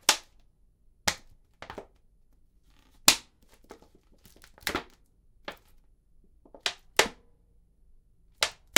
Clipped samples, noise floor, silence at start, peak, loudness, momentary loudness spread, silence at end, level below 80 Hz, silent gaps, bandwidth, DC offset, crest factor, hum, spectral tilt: under 0.1%; -62 dBFS; 0.1 s; 0 dBFS; -28 LUFS; 23 LU; 0.25 s; -58 dBFS; none; 18 kHz; under 0.1%; 34 dB; none; 0 dB/octave